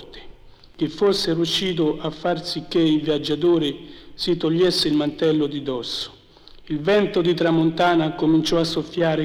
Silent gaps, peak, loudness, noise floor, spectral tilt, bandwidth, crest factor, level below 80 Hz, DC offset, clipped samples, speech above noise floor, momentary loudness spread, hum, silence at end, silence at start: none; -8 dBFS; -21 LUFS; -46 dBFS; -5.5 dB/octave; 15 kHz; 14 dB; -48 dBFS; under 0.1%; under 0.1%; 26 dB; 9 LU; none; 0 s; 0 s